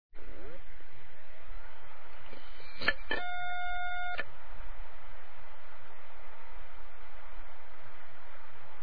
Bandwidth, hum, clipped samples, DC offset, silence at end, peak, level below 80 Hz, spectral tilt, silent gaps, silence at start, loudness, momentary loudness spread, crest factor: 5.4 kHz; none; under 0.1%; 5%; 0 s; -12 dBFS; -50 dBFS; -6 dB/octave; none; 0.1 s; -39 LUFS; 18 LU; 28 dB